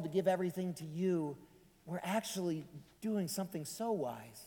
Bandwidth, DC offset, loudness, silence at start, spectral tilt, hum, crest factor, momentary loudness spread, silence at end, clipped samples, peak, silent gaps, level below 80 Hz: 19 kHz; under 0.1%; -38 LUFS; 0 s; -5.5 dB/octave; none; 18 dB; 10 LU; 0 s; under 0.1%; -20 dBFS; none; -74 dBFS